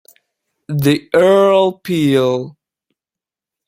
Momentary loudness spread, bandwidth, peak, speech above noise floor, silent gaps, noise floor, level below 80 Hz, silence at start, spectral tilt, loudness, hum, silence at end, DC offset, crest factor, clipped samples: 12 LU; 16.5 kHz; 0 dBFS; 75 dB; none; -88 dBFS; -56 dBFS; 0.7 s; -6.5 dB/octave; -14 LUFS; none; 1.15 s; under 0.1%; 16 dB; under 0.1%